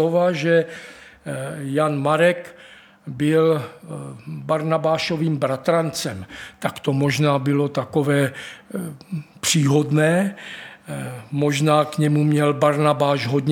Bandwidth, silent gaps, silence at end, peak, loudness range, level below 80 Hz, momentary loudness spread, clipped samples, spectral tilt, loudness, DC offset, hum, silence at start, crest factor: 17 kHz; none; 0 s; -2 dBFS; 3 LU; -62 dBFS; 16 LU; under 0.1%; -5.5 dB/octave; -20 LUFS; under 0.1%; none; 0 s; 18 dB